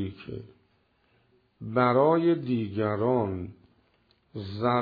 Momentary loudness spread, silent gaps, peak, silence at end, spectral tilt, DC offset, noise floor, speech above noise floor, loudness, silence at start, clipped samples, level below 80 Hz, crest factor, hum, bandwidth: 21 LU; none; -8 dBFS; 0 s; -10.5 dB/octave; under 0.1%; -68 dBFS; 42 dB; -26 LUFS; 0 s; under 0.1%; -64 dBFS; 20 dB; none; 5 kHz